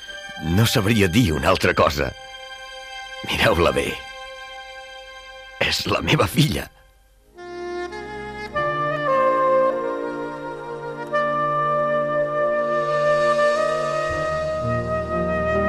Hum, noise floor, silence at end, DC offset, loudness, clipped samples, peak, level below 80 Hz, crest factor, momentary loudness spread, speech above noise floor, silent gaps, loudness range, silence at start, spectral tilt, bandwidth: none; -54 dBFS; 0 s; under 0.1%; -21 LUFS; under 0.1%; -4 dBFS; -44 dBFS; 18 dB; 17 LU; 34 dB; none; 4 LU; 0 s; -5 dB/octave; 15.5 kHz